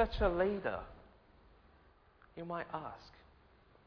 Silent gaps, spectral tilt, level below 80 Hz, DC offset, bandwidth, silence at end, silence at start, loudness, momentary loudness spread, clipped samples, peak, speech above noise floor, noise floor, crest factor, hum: none; -4.5 dB/octave; -50 dBFS; under 0.1%; 5.4 kHz; 0.75 s; 0 s; -38 LUFS; 23 LU; under 0.1%; -18 dBFS; 29 dB; -66 dBFS; 22 dB; none